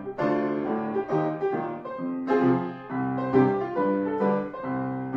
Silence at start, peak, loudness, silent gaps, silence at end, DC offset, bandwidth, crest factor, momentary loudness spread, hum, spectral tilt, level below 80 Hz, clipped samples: 0 s; -8 dBFS; -26 LUFS; none; 0 s; under 0.1%; 6 kHz; 18 dB; 9 LU; none; -9.5 dB/octave; -64 dBFS; under 0.1%